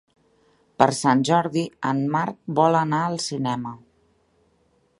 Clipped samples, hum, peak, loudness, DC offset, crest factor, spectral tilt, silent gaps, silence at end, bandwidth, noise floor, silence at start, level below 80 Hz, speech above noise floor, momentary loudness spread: under 0.1%; none; 0 dBFS; -22 LUFS; under 0.1%; 24 dB; -5.5 dB/octave; none; 1.2 s; 11.5 kHz; -64 dBFS; 0.8 s; -66 dBFS; 43 dB; 8 LU